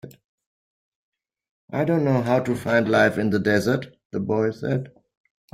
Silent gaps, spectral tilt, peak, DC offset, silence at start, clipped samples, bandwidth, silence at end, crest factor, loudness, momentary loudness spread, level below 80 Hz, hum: 0.24-0.38 s, 0.46-1.12 s, 1.49-1.68 s, 4.05-4.10 s; -7 dB/octave; -6 dBFS; under 0.1%; 0.05 s; under 0.1%; 15.5 kHz; 0.65 s; 18 dB; -22 LUFS; 11 LU; -60 dBFS; none